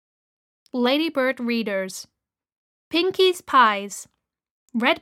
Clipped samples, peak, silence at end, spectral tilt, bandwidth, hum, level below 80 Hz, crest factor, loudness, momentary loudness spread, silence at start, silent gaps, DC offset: under 0.1%; -4 dBFS; 0.05 s; -3 dB/octave; 16 kHz; none; -72 dBFS; 20 dB; -21 LUFS; 15 LU; 0.75 s; 2.52-2.91 s, 4.51-4.68 s; under 0.1%